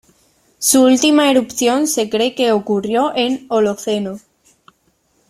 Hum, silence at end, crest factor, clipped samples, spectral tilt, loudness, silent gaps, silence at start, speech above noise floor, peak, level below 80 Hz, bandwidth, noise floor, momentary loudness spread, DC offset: none; 1.1 s; 16 dB; under 0.1%; -3 dB/octave; -15 LUFS; none; 0.6 s; 46 dB; 0 dBFS; -58 dBFS; 16.5 kHz; -61 dBFS; 10 LU; under 0.1%